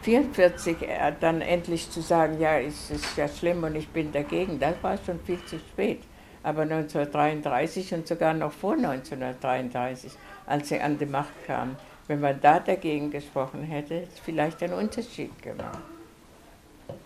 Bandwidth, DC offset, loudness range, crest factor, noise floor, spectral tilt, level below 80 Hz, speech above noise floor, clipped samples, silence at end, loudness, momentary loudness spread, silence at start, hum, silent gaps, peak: 15 kHz; under 0.1%; 4 LU; 22 dB; -52 dBFS; -6 dB/octave; -52 dBFS; 25 dB; under 0.1%; 0 s; -28 LUFS; 14 LU; 0 s; none; none; -6 dBFS